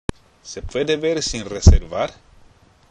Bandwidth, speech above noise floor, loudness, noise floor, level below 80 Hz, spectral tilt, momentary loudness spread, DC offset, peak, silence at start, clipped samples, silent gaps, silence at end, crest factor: 10.5 kHz; 34 dB; -19 LUFS; -51 dBFS; -22 dBFS; -5.5 dB/octave; 17 LU; under 0.1%; 0 dBFS; 0.45 s; 0.1%; none; 0.8 s; 20 dB